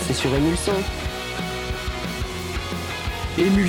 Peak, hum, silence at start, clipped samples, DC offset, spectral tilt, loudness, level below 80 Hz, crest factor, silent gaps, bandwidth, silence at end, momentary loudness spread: -8 dBFS; none; 0 s; under 0.1%; under 0.1%; -5 dB/octave; -25 LUFS; -34 dBFS; 16 dB; none; 18 kHz; 0 s; 8 LU